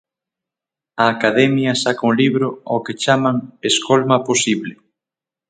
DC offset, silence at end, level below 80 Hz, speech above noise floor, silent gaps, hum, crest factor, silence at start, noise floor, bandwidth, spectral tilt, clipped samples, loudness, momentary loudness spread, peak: under 0.1%; 0.75 s; -62 dBFS; 72 dB; none; none; 18 dB; 0.95 s; -88 dBFS; 9.6 kHz; -4 dB/octave; under 0.1%; -17 LUFS; 8 LU; 0 dBFS